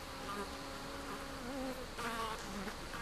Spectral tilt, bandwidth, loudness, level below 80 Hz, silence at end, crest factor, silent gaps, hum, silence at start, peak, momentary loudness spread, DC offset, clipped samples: -3.5 dB/octave; 15.5 kHz; -43 LUFS; -54 dBFS; 0 s; 16 dB; none; none; 0 s; -26 dBFS; 4 LU; under 0.1%; under 0.1%